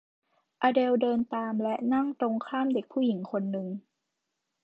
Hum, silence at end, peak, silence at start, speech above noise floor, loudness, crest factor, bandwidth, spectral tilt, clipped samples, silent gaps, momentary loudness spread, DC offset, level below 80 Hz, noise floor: none; 0.85 s; -12 dBFS; 0.6 s; 55 dB; -29 LUFS; 18 dB; 5.2 kHz; -8.5 dB/octave; under 0.1%; none; 7 LU; under 0.1%; -76 dBFS; -83 dBFS